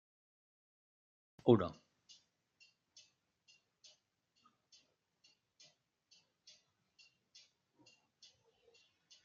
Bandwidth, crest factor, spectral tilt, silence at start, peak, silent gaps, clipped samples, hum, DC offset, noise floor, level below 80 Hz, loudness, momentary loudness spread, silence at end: 7.4 kHz; 32 dB; -7 dB/octave; 1.45 s; -14 dBFS; none; under 0.1%; none; under 0.1%; -81 dBFS; -82 dBFS; -34 LUFS; 32 LU; 7.5 s